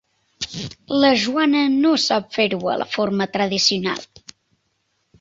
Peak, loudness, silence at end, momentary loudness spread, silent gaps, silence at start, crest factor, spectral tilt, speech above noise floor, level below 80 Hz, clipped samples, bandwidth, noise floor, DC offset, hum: -2 dBFS; -19 LUFS; 1.15 s; 12 LU; none; 0.4 s; 18 dB; -4 dB/octave; 50 dB; -58 dBFS; under 0.1%; 7.8 kHz; -69 dBFS; under 0.1%; none